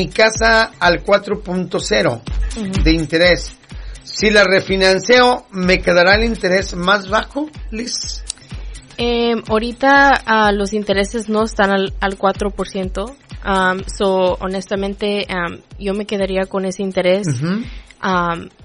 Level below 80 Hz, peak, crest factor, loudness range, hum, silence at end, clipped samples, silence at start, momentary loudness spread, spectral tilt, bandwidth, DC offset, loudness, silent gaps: -30 dBFS; -2 dBFS; 16 dB; 6 LU; none; 0 s; under 0.1%; 0 s; 14 LU; -4.5 dB/octave; 11 kHz; under 0.1%; -16 LUFS; none